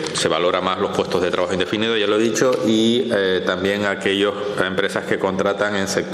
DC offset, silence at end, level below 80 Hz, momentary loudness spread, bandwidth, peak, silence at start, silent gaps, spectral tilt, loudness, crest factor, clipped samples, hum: under 0.1%; 0 s; -58 dBFS; 4 LU; 14 kHz; -2 dBFS; 0 s; none; -4 dB/octave; -19 LUFS; 18 dB; under 0.1%; none